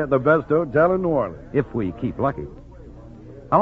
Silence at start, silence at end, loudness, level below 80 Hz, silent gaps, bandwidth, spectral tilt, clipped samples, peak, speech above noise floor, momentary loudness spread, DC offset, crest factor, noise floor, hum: 0 s; 0 s; -21 LUFS; -44 dBFS; none; 5.8 kHz; -10 dB/octave; under 0.1%; -4 dBFS; 20 dB; 24 LU; under 0.1%; 18 dB; -41 dBFS; none